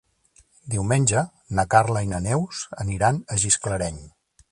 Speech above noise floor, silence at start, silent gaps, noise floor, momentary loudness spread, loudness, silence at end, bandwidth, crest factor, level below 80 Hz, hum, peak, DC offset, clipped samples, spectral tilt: 37 dB; 0.65 s; none; -59 dBFS; 11 LU; -23 LUFS; 0.45 s; 11.5 kHz; 22 dB; -44 dBFS; none; -2 dBFS; under 0.1%; under 0.1%; -4.5 dB/octave